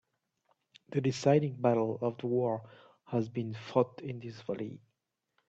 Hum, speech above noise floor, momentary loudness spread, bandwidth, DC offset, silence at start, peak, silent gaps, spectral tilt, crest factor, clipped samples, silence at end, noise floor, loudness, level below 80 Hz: none; 51 dB; 13 LU; 8.2 kHz; under 0.1%; 0.9 s; -12 dBFS; none; -7.5 dB/octave; 22 dB; under 0.1%; 0.7 s; -83 dBFS; -33 LUFS; -74 dBFS